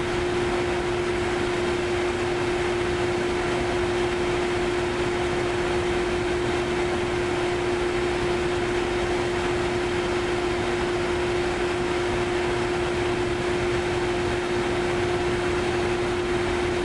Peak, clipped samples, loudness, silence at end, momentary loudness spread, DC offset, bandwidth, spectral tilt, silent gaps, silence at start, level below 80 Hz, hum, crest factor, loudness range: -12 dBFS; under 0.1%; -25 LUFS; 0 s; 1 LU; under 0.1%; 11.5 kHz; -5 dB/octave; none; 0 s; -40 dBFS; none; 12 dB; 0 LU